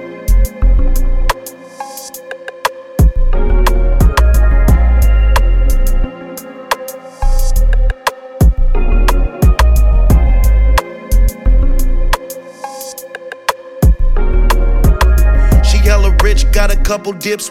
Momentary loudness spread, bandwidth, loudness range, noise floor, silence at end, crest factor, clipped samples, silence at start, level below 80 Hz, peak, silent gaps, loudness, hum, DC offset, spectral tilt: 15 LU; 15.5 kHz; 5 LU; -29 dBFS; 0 s; 10 dB; under 0.1%; 0 s; -10 dBFS; 0 dBFS; none; -14 LUFS; none; 3%; -5.5 dB/octave